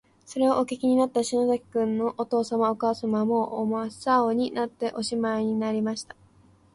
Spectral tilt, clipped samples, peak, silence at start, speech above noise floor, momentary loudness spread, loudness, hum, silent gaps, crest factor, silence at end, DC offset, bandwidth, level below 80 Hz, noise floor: -5.5 dB/octave; under 0.1%; -10 dBFS; 0.3 s; 33 dB; 6 LU; -26 LUFS; none; none; 16 dB; 0.7 s; under 0.1%; 11.5 kHz; -66 dBFS; -58 dBFS